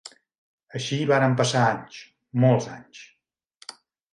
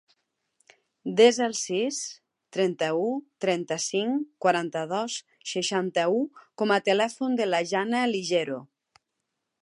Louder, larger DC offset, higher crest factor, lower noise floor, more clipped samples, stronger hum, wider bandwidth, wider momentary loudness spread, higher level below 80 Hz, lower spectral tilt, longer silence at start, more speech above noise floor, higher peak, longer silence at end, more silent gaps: first, -23 LUFS vs -26 LUFS; neither; about the same, 18 dB vs 20 dB; second, -58 dBFS vs -82 dBFS; neither; neither; about the same, 11.5 kHz vs 11.5 kHz; first, 22 LU vs 11 LU; first, -68 dBFS vs -82 dBFS; first, -5.5 dB/octave vs -3.5 dB/octave; second, 0.05 s vs 1.05 s; second, 35 dB vs 56 dB; about the same, -6 dBFS vs -6 dBFS; second, 0.45 s vs 1 s; first, 0.38-0.58 s vs none